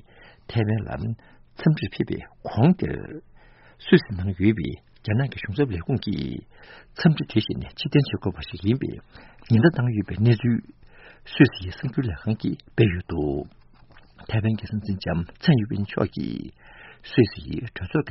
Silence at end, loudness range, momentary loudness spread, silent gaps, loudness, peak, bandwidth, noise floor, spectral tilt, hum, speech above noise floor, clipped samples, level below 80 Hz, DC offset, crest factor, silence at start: 0 s; 4 LU; 13 LU; none; -24 LUFS; -2 dBFS; 5.8 kHz; -51 dBFS; -6.5 dB/octave; none; 27 dB; under 0.1%; -46 dBFS; under 0.1%; 22 dB; 0.5 s